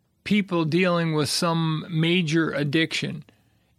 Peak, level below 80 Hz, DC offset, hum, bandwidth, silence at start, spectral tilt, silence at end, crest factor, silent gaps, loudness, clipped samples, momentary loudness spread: -8 dBFS; -64 dBFS; under 0.1%; none; 14.5 kHz; 0.25 s; -5.5 dB/octave; 0.55 s; 16 dB; none; -23 LUFS; under 0.1%; 4 LU